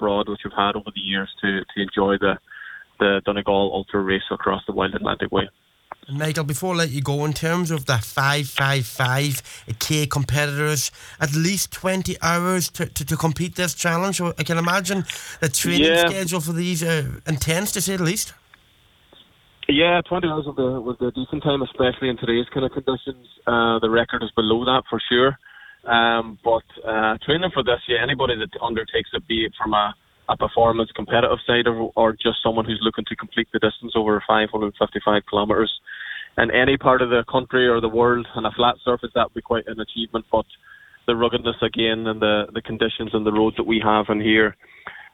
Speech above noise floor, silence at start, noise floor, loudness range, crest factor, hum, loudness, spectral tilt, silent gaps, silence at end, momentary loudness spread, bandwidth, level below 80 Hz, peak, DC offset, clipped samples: 35 dB; 0 s; -56 dBFS; 3 LU; 20 dB; none; -21 LUFS; -4.5 dB/octave; none; 0.05 s; 8 LU; 19 kHz; -46 dBFS; -2 dBFS; under 0.1%; under 0.1%